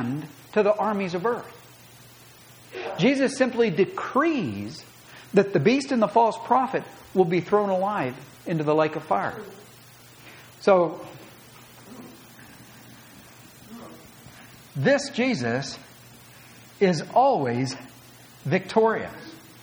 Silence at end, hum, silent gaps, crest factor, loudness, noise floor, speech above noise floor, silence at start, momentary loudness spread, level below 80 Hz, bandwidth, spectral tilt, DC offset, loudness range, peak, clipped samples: 0.25 s; none; none; 20 dB; -24 LUFS; -49 dBFS; 27 dB; 0 s; 23 LU; -66 dBFS; over 20 kHz; -6 dB/octave; under 0.1%; 6 LU; -6 dBFS; under 0.1%